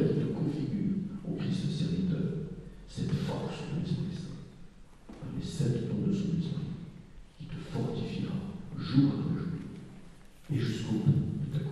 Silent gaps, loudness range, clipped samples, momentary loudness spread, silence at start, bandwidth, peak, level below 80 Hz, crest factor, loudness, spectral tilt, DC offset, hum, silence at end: none; 4 LU; under 0.1%; 16 LU; 0 s; 11.5 kHz; -12 dBFS; -54 dBFS; 20 dB; -33 LUFS; -8 dB/octave; under 0.1%; none; 0 s